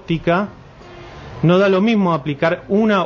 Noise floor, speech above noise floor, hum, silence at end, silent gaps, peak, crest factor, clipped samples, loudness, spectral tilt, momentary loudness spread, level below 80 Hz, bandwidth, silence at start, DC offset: -38 dBFS; 23 dB; none; 0 s; none; -2 dBFS; 14 dB; under 0.1%; -16 LUFS; -8 dB/octave; 19 LU; -46 dBFS; 7 kHz; 0.1 s; under 0.1%